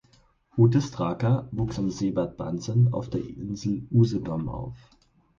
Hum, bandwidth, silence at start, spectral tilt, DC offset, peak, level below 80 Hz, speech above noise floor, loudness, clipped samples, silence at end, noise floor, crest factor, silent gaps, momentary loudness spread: none; 7.4 kHz; 0.55 s; -8 dB/octave; under 0.1%; -8 dBFS; -50 dBFS; 36 dB; -26 LUFS; under 0.1%; 0.6 s; -61 dBFS; 18 dB; none; 12 LU